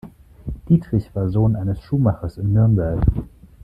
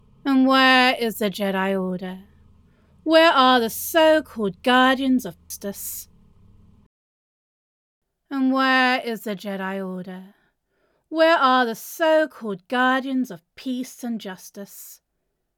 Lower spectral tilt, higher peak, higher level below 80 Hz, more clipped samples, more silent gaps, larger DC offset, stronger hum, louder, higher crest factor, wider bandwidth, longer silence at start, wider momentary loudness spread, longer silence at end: first, -11.5 dB/octave vs -4 dB/octave; about the same, -4 dBFS vs -2 dBFS; first, -32 dBFS vs -62 dBFS; neither; second, none vs 6.86-8.02 s; neither; neither; about the same, -20 LUFS vs -20 LUFS; about the same, 16 dB vs 20 dB; second, 5.2 kHz vs 20 kHz; second, 0.05 s vs 0.25 s; second, 14 LU vs 19 LU; second, 0.4 s vs 0.65 s